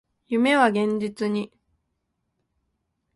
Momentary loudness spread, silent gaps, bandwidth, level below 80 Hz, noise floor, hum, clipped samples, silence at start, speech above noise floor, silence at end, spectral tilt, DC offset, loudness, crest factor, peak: 11 LU; none; 11.5 kHz; -68 dBFS; -77 dBFS; none; under 0.1%; 0.3 s; 55 dB; 1.7 s; -5.5 dB/octave; under 0.1%; -23 LUFS; 22 dB; -4 dBFS